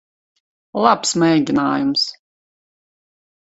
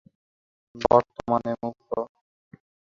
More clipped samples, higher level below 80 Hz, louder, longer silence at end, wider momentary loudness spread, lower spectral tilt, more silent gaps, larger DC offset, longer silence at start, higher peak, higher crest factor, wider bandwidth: neither; about the same, -60 dBFS vs -56 dBFS; first, -17 LUFS vs -25 LUFS; first, 1.4 s vs 0.9 s; second, 6 LU vs 12 LU; second, -4 dB/octave vs -7.5 dB/octave; neither; neither; about the same, 0.75 s vs 0.75 s; about the same, 0 dBFS vs -2 dBFS; about the same, 20 dB vs 24 dB; first, 8.2 kHz vs 7.2 kHz